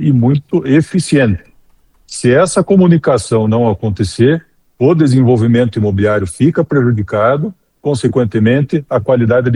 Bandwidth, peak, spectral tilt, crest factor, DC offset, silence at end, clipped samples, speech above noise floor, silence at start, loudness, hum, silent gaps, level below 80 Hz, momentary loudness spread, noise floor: 11.5 kHz; 0 dBFS; -7 dB/octave; 12 dB; under 0.1%; 0 s; under 0.1%; 38 dB; 0 s; -12 LUFS; none; none; -42 dBFS; 7 LU; -49 dBFS